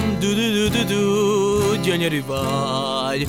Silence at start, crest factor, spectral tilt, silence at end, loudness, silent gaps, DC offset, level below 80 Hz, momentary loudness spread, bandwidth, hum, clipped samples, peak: 0 s; 14 dB; -5 dB/octave; 0 s; -20 LUFS; none; under 0.1%; -42 dBFS; 4 LU; 16.5 kHz; none; under 0.1%; -6 dBFS